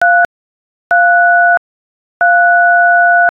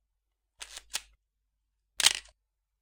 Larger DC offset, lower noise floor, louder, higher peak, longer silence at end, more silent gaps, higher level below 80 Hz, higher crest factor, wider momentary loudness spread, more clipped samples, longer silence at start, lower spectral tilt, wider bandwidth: neither; first, under -90 dBFS vs -82 dBFS; first, -9 LUFS vs -28 LUFS; about the same, -2 dBFS vs -2 dBFS; second, 0.05 s vs 0.6 s; first, 0.25-0.90 s, 1.57-2.20 s vs none; first, -60 dBFS vs -66 dBFS; second, 8 dB vs 34 dB; second, 7 LU vs 20 LU; neither; second, 0 s vs 0.6 s; first, -3.5 dB/octave vs 2.5 dB/octave; second, 3.7 kHz vs 18 kHz